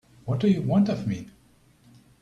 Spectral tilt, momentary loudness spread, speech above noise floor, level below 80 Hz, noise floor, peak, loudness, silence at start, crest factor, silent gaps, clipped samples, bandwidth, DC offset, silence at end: -8.5 dB/octave; 10 LU; 35 dB; -58 dBFS; -58 dBFS; -10 dBFS; -25 LUFS; 0.25 s; 16 dB; none; under 0.1%; 7.4 kHz; under 0.1%; 0.95 s